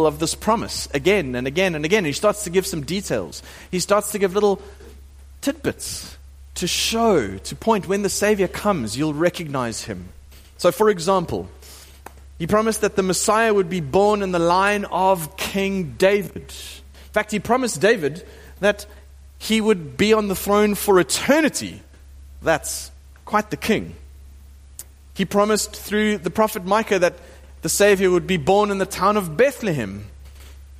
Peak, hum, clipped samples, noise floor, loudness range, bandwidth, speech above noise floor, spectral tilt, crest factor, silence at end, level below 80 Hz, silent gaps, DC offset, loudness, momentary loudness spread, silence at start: -4 dBFS; none; under 0.1%; -43 dBFS; 5 LU; 15.5 kHz; 24 dB; -4 dB/octave; 16 dB; 0 s; -44 dBFS; none; under 0.1%; -20 LUFS; 14 LU; 0 s